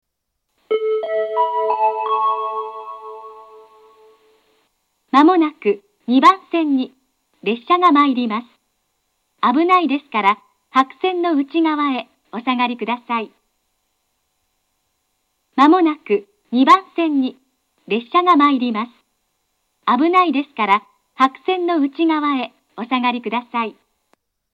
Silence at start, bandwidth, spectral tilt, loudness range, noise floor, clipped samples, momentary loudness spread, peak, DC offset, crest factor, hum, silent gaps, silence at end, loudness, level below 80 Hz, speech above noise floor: 0.7 s; 8.8 kHz; -5.5 dB/octave; 6 LU; -75 dBFS; under 0.1%; 14 LU; 0 dBFS; under 0.1%; 18 dB; none; none; 0.8 s; -17 LUFS; -78 dBFS; 59 dB